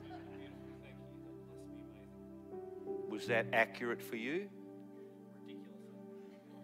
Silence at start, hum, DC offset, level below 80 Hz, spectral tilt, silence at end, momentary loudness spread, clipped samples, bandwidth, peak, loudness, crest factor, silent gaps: 0 s; none; under 0.1%; -74 dBFS; -5.5 dB/octave; 0 s; 20 LU; under 0.1%; 16 kHz; -18 dBFS; -40 LUFS; 26 dB; none